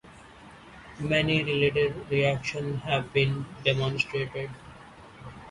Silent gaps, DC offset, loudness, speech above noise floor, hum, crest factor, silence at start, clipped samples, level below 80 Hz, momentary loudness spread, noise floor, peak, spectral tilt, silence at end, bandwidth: none; under 0.1%; -27 LUFS; 22 dB; none; 22 dB; 0.05 s; under 0.1%; -54 dBFS; 22 LU; -49 dBFS; -8 dBFS; -6 dB/octave; 0 s; 11 kHz